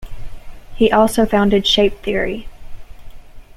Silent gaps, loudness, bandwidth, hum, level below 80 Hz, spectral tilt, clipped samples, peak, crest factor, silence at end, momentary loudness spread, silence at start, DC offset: none; -15 LUFS; 15 kHz; none; -32 dBFS; -4.5 dB/octave; under 0.1%; -2 dBFS; 16 dB; 0 s; 9 LU; 0 s; under 0.1%